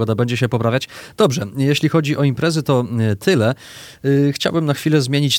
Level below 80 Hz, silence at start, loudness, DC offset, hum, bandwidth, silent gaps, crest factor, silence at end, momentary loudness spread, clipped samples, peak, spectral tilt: -54 dBFS; 0 s; -18 LUFS; under 0.1%; none; 17 kHz; none; 14 dB; 0 s; 5 LU; under 0.1%; -2 dBFS; -6 dB/octave